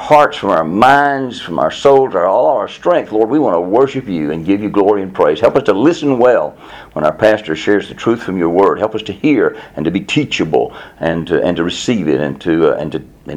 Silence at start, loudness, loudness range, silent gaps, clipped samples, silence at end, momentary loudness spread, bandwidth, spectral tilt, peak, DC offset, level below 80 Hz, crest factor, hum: 0 s; -14 LUFS; 3 LU; none; 0.2%; 0 s; 8 LU; 11 kHz; -6 dB/octave; 0 dBFS; under 0.1%; -46 dBFS; 14 dB; none